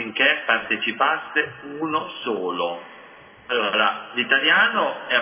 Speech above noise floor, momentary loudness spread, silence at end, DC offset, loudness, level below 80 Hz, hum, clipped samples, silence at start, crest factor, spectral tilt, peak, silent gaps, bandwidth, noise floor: 24 dB; 11 LU; 0 s; under 0.1%; -21 LUFS; -70 dBFS; none; under 0.1%; 0 s; 20 dB; -6.5 dB/octave; -4 dBFS; none; 3.6 kHz; -46 dBFS